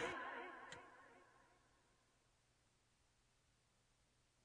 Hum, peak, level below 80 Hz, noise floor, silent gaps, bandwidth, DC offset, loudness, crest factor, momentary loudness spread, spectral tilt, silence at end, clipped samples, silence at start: none; -34 dBFS; -82 dBFS; -80 dBFS; none; 10 kHz; under 0.1%; -52 LUFS; 24 dB; 19 LU; -3 dB/octave; 2.75 s; under 0.1%; 0 s